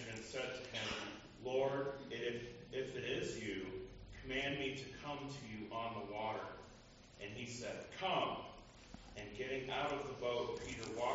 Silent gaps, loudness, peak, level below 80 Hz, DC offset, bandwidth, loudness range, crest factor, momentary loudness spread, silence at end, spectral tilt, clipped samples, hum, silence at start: none; -43 LUFS; -26 dBFS; -64 dBFS; under 0.1%; 7.6 kHz; 3 LU; 18 dB; 14 LU; 0 s; -3 dB/octave; under 0.1%; none; 0 s